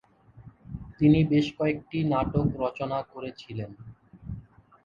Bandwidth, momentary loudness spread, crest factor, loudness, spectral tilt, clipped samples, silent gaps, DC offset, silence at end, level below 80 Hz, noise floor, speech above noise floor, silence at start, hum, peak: 7.2 kHz; 21 LU; 18 dB; -26 LUFS; -8.5 dB/octave; under 0.1%; none; under 0.1%; 0.45 s; -48 dBFS; -51 dBFS; 26 dB; 0.35 s; none; -10 dBFS